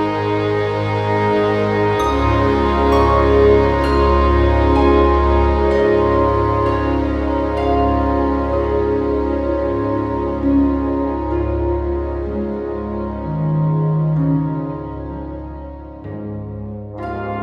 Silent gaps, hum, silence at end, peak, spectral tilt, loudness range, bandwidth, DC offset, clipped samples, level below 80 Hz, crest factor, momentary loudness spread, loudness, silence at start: none; none; 0 s; 0 dBFS; -8.5 dB/octave; 7 LU; 7.6 kHz; under 0.1%; under 0.1%; -24 dBFS; 16 dB; 14 LU; -17 LUFS; 0 s